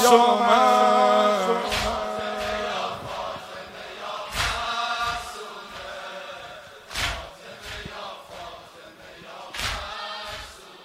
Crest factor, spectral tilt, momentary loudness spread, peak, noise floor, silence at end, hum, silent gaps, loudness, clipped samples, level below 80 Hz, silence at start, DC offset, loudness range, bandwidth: 24 dB; -3 dB/octave; 22 LU; -2 dBFS; -45 dBFS; 0 s; none; none; -23 LUFS; under 0.1%; -46 dBFS; 0 s; under 0.1%; 13 LU; 16 kHz